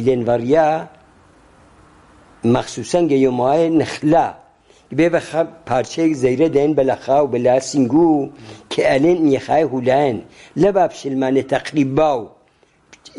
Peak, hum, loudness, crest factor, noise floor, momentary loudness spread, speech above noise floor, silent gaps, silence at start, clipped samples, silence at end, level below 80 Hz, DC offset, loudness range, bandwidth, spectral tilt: -2 dBFS; none; -17 LUFS; 14 dB; -56 dBFS; 7 LU; 40 dB; none; 0 s; under 0.1%; 0.9 s; -50 dBFS; under 0.1%; 3 LU; 11.5 kHz; -6.5 dB/octave